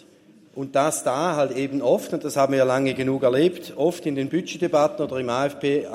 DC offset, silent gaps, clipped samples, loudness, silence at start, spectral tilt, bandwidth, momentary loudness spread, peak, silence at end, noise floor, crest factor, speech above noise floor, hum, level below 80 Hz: under 0.1%; none; under 0.1%; -23 LUFS; 0.55 s; -5 dB/octave; 16 kHz; 6 LU; -6 dBFS; 0 s; -52 dBFS; 16 dB; 30 dB; none; -68 dBFS